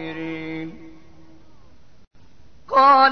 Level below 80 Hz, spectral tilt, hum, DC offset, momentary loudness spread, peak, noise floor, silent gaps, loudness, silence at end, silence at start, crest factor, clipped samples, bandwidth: -56 dBFS; -5.5 dB/octave; none; 0.8%; 20 LU; -4 dBFS; -53 dBFS; 2.07-2.11 s; -19 LUFS; 0 s; 0 s; 18 dB; under 0.1%; 6.2 kHz